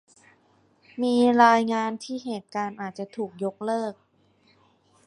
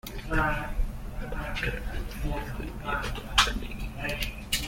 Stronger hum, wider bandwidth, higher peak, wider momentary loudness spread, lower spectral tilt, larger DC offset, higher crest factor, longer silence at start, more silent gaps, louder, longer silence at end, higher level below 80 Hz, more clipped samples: neither; second, 11 kHz vs 16.5 kHz; about the same, -4 dBFS vs -6 dBFS; first, 16 LU vs 13 LU; first, -5 dB/octave vs -3.5 dB/octave; neither; about the same, 22 dB vs 24 dB; first, 0.95 s vs 0.05 s; neither; first, -25 LUFS vs -31 LUFS; first, 1.15 s vs 0 s; second, -76 dBFS vs -34 dBFS; neither